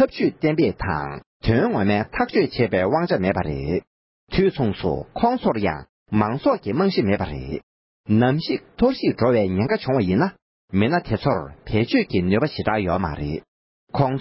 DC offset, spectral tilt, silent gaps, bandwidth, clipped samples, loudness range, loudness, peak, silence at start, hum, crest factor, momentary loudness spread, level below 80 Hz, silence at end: under 0.1%; -11.5 dB/octave; 1.26-1.40 s, 3.87-4.27 s, 5.89-6.06 s, 7.63-8.04 s, 10.42-10.68 s, 13.48-13.87 s; 5.8 kHz; under 0.1%; 2 LU; -22 LUFS; -4 dBFS; 0 s; none; 16 dB; 8 LU; -40 dBFS; 0 s